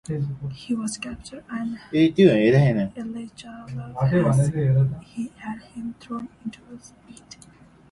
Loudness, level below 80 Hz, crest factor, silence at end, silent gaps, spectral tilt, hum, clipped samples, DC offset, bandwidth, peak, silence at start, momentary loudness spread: -22 LUFS; -52 dBFS; 20 dB; 0.8 s; none; -7 dB/octave; none; under 0.1%; under 0.1%; 11.5 kHz; -2 dBFS; 0.1 s; 20 LU